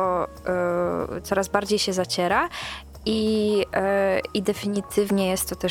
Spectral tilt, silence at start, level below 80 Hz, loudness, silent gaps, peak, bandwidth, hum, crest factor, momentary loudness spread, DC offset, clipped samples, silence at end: -4.5 dB/octave; 0 s; -48 dBFS; -24 LUFS; none; -4 dBFS; 17.5 kHz; none; 20 dB; 5 LU; under 0.1%; under 0.1%; 0 s